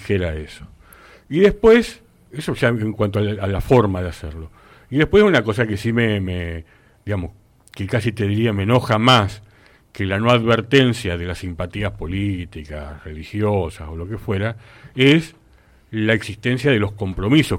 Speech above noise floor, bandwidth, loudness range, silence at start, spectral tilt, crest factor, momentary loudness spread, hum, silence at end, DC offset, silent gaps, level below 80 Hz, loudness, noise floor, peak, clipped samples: 33 dB; 16 kHz; 5 LU; 0 s; -6.5 dB/octave; 16 dB; 19 LU; none; 0 s; under 0.1%; none; -40 dBFS; -19 LUFS; -52 dBFS; -4 dBFS; under 0.1%